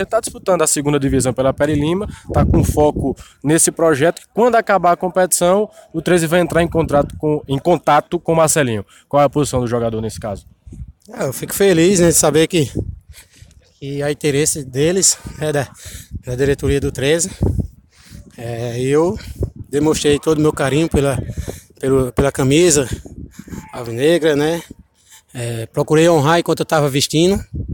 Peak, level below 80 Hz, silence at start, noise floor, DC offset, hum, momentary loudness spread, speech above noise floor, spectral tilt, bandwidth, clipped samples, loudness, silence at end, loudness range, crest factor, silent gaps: 0 dBFS; -34 dBFS; 0 s; -48 dBFS; under 0.1%; none; 15 LU; 32 dB; -4.5 dB/octave; 17.5 kHz; under 0.1%; -16 LUFS; 0 s; 4 LU; 16 dB; none